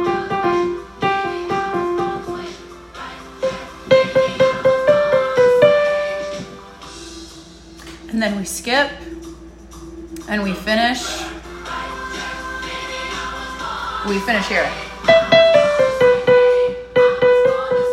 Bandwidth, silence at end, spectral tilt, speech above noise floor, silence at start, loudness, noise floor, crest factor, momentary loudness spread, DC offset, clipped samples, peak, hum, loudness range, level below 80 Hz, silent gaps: 15 kHz; 0 s; -4 dB/octave; 20 dB; 0 s; -17 LUFS; -39 dBFS; 18 dB; 21 LU; under 0.1%; under 0.1%; 0 dBFS; none; 10 LU; -44 dBFS; none